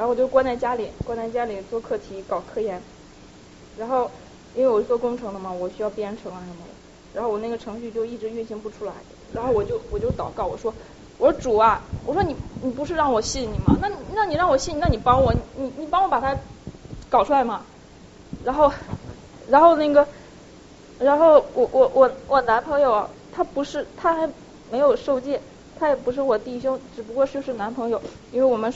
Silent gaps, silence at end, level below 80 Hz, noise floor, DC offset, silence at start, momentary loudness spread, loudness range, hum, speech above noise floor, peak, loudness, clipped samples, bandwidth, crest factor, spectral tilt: none; 0 s; -40 dBFS; -46 dBFS; under 0.1%; 0 s; 15 LU; 10 LU; none; 24 dB; -2 dBFS; -22 LUFS; under 0.1%; 8 kHz; 20 dB; -5 dB/octave